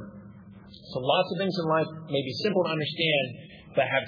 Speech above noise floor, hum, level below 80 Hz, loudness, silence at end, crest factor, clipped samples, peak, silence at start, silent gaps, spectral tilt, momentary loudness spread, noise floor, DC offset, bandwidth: 21 dB; none; -66 dBFS; -27 LUFS; 0 s; 18 dB; under 0.1%; -10 dBFS; 0 s; none; -6.5 dB/octave; 18 LU; -48 dBFS; under 0.1%; 5.2 kHz